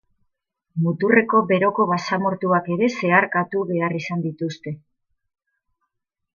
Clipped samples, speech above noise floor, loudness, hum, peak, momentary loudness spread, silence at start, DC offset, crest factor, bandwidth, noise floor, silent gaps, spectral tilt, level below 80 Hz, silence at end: under 0.1%; 57 dB; -20 LUFS; none; -2 dBFS; 12 LU; 0.75 s; under 0.1%; 20 dB; 7.2 kHz; -77 dBFS; none; -7 dB/octave; -70 dBFS; 1.6 s